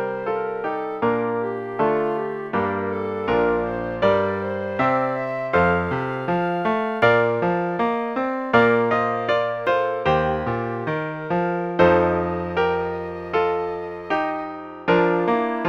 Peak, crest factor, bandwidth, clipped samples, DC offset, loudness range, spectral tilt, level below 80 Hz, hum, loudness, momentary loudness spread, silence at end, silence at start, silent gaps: -4 dBFS; 18 dB; 7 kHz; under 0.1%; under 0.1%; 3 LU; -8 dB/octave; -50 dBFS; none; -22 LUFS; 8 LU; 0 s; 0 s; none